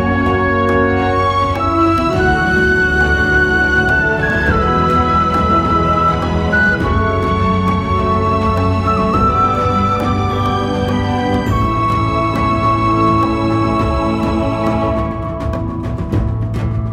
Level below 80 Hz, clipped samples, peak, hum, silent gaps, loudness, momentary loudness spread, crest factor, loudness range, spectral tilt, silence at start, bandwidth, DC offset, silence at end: -26 dBFS; under 0.1%; 0 dBFS; none; none; -14 LUFS; 5 LU; 14 dB; 3 LU; -7 dB/octave; 0 s; 12.5 kHz; under 0.1%; 0 s